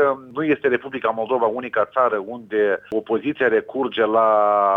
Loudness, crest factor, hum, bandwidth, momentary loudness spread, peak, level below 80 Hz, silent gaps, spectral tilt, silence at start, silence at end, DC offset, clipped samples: -20 LUFS; 16 dB; none; 4 kHz; 8 LU; -4 dBFS; -66 dBFS; none; -7.5 dB/octave; 0 s; 0 s; under 0.1%; under 0.1%